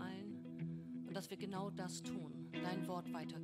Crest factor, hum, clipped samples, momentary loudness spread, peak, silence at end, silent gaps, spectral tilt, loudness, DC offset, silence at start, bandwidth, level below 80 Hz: 16 dB; none; under 0.1%; 4 LU; -30 dBFS; 0 s; none; -5.5 dB/octave; -47 LUFS; under 0.1%; 0 s; 15 kHz; -80 dBFS